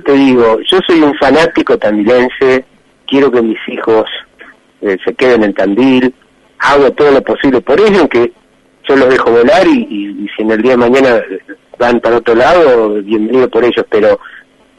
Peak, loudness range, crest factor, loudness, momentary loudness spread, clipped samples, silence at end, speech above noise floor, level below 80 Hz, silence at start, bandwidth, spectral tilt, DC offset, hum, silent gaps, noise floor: 0 dBFS; 3 LU; 10 dB; -9 LUFS; 9 LU; under 0.1%; 0.4 s; 30 dB; -42 dBFS; 0.05 s; 11 kHz; -5.5 dB/octave; under 0.1%; none; none; -39 dBFS